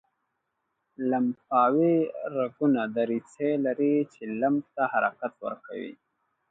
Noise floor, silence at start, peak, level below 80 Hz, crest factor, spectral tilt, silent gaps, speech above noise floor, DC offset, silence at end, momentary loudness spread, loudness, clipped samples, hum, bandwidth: -79 dBFS; 1 s; -10 dBFS; -78 dBFS; 18 dB; -8.5 dB/octave; none; 53 dB; under 0.1%; 0.55 s; 13 LU; -27 LUFS; under 0.1%; none; 7.8 kHz